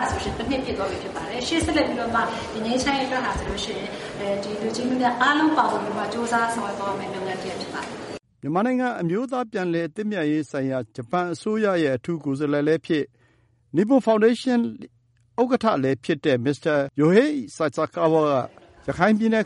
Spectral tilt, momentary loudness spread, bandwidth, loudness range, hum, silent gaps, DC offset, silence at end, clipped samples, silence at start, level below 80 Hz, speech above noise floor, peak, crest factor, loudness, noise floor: -5.5 dB/octave; 11 LU; 11.5 kHz; 4 LU; none; none; under 0.1%; 0 s; under 0.1%; 0 s; -48 dBFS; 38 dB; -4 dBFS; 20 dB; -23 LUFS; -61 dBFS